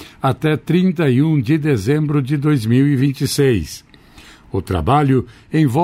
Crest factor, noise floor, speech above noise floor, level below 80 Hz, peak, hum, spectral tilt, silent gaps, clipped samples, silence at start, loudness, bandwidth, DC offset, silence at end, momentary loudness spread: 12 dB; -43 dBFS; 28 dB; -40 dBFS; -4 dBFS; none; -7 dB/octave; none; under 0.1%; 0 s; -17 LUFS; 16 kHz; under 0.1%; 0 s; 7 LU